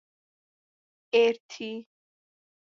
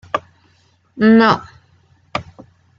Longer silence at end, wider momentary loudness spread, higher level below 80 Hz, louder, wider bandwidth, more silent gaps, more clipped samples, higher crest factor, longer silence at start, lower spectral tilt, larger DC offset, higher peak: first, 0.9 s vs 0.55 s; about the same, 15 LU vs 17 LU; second, -86 dBFS vs -56 dBFS; second, -26 LUFS vs -16 LUFS; about the same, 7.2 kHz vs 7 kHz; first, 1.40-1.49 s vs none; neither; about the same, 20 dB vs 18 dB; first, 1.15 s vs 0.15 s; second, -3.5 dB/octave vs -7 dB/octave; neither; second, -10 dBFS vs 0 dBFS